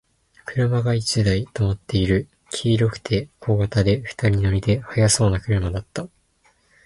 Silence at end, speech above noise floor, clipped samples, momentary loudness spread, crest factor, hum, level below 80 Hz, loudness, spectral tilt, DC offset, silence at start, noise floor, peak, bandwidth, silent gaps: 0.8 s; 41 dB; under 0.1%; 11 LU; 16 dB; none; -38 dBFS; -21 LUFS; -5.5 dB/octave; under 0.1%; 0.45 s; -61 dBFS; -4 dBFS; 11.5 kHz; none